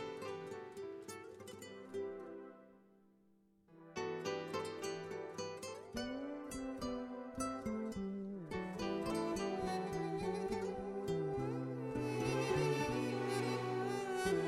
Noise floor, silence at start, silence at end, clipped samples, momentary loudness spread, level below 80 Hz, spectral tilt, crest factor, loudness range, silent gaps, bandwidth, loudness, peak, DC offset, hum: -71 dBFS; 0 s; 0 s; under 0.1%; 11 LU; -64 dBFS; -5.5 dB/octave; 18 dB; 10 LU; none; 15.5 kHz; -41 LUFS; -24 dBFS; under 0.1%; none